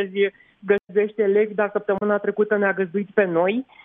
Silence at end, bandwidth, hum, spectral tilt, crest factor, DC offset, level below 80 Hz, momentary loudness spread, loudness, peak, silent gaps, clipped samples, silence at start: 0.2 s; 3.8 kHz; none; -9.5 dB/octave; 16 dB; under 0.1%; -68 dBFS; 4 LU; -22 LUFS; -4 dBFS; none; under 0.1%; 0 s